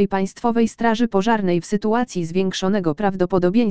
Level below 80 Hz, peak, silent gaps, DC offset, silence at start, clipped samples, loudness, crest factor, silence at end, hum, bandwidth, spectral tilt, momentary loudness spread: -48 dBFS; -4 dBFS; none; 2%; 0 s; under 0.1%; -20 LUFS; 16 dB; 0 s; none; 9.4 kHz; -6 dB/octave; 4 LU